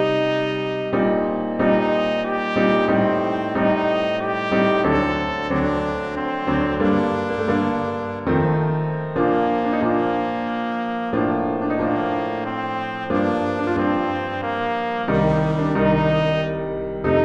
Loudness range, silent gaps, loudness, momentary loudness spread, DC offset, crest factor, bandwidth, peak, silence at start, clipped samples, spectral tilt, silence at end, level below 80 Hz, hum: 3 LU; none; -21 LUFS; 6 LU; under 0.1%; 16 dB; 8.4 kHz; -4 dBFS; 0 s; under 0.1%; -8 dB/octave; 0 s; -42 dBFS; none